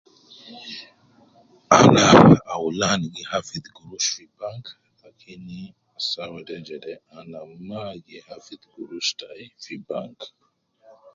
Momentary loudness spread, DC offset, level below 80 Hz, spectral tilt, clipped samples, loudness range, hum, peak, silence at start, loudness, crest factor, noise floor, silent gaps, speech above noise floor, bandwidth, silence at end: 29 LU; under 0.1%; -52 dBFS; -4.5 dB/octave; under 0.1%; 16 LU; none; 0 dBFS; 0.5 s; -18 LUFS; 22 dB; -57 dBFS; none; 36 dB; 7.8 kHz; 0.9 s